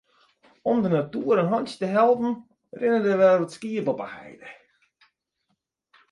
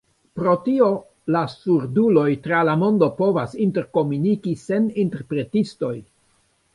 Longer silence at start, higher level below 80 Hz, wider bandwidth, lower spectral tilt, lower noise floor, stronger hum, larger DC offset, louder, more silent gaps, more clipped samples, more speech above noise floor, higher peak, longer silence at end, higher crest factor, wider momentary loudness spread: first, 0.65 s vs 0.35 s; second, -70 dBFS vs -60 dBFS; about the same, 11.5 kHz vs 11 kHz; about the same, -7.5 dB/octave vs -8.5 dB/octave; first, -76 dBFS vs -63 dBFS; neither; neither; about the same, -23 LUFS vs -21 LUFS; neither; neither; first, 53 dB vs 43 dB; second, -8 dBFS vs -4 dBFS; first, 1.6 s vs 0.7 s; about the same, 16 dB vs 18 dB; first, 16 LU vs 8 LU